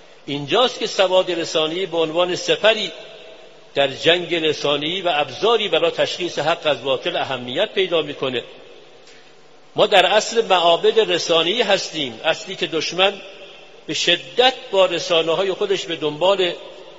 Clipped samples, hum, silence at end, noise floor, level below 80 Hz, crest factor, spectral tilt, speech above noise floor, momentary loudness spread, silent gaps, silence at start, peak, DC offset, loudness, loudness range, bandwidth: under 0.1%; none; 0 s; -49 dBFS; -62 dBFS; 20 dB; -1 dB/octave; 30 dB; 9 LU; none; 0.25 s; 0 dBFS; 0.4%; -19 LUFS; 4 LU; 8 kHz